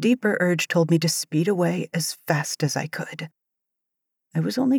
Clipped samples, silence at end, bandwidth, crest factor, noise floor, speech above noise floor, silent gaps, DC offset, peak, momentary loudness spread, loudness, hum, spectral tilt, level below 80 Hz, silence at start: under 0.1%; 0 s; 20 kHz; 18 dB; -82 dBFS; 60 dB; none; under 0.1%; -6 dBFS; 11 LU; -23 LUFS; none; -5 dB/octave; -82 dBFS; 0 s